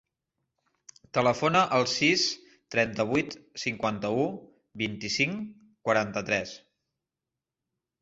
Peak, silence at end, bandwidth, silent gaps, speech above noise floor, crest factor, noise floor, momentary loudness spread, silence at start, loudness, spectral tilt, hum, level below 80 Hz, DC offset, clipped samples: -8 dBFS; 1.45 s; 8 kHz; none; 61 dB; 20 dB; -89 dBFS; 14 LU; 1.15 s; -27 LUFS; -4 dB/octave; none; -64 dBFS; under 0.1%; under 0.1%